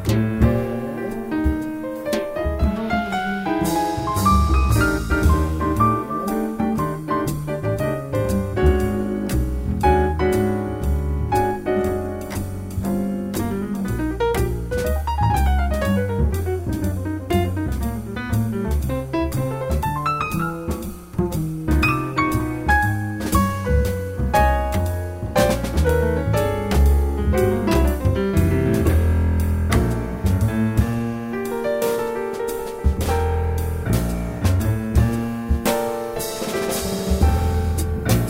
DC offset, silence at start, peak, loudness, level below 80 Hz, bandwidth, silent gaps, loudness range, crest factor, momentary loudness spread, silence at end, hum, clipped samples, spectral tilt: under 0.1%; 0 s; -4 dBFS; -21 LUFS; -26 dBFS; 16.5 kHz; none; 4 LU; 16 dB; 7 LU; 0 s; none; under 0.1%; -6.5 dB/octave